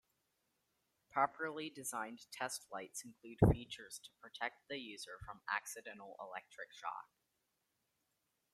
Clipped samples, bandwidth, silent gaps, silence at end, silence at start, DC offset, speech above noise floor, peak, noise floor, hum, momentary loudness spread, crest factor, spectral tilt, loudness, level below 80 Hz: under 0.1%; 15.5 kHz; none; 1.5 s; 1.15 s; under 0.1%; 43 dB; -16 dBFS; -85 dBFS; none; 18 LU; 28 dB; -5 dB/octave; -42 LUFS; -56 dBFS